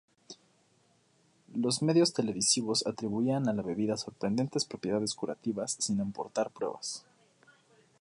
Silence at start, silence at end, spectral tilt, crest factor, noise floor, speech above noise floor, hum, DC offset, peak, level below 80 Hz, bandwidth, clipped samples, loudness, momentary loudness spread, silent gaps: 0.3 s; 1.05 s; -4 dB/octave; 20 dB; -68 dBFS; 37 dB; none; under 0.1%; -12 dBFS; -70 dBFS; 11.5 kHz; under 0.1%; -31 LUFS; 13 LU; none